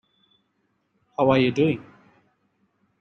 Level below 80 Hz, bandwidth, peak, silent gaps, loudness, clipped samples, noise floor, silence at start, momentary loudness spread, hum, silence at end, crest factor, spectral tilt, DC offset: -62 dBFS; 6.8 kHz; -6 dBFS; none; -22 LUFS; under 0.1%; -71 dBFS; 1.2 s; 13 LU; none; 1.2 s; 20 dB; -7.5 dB/octave; under 0.1%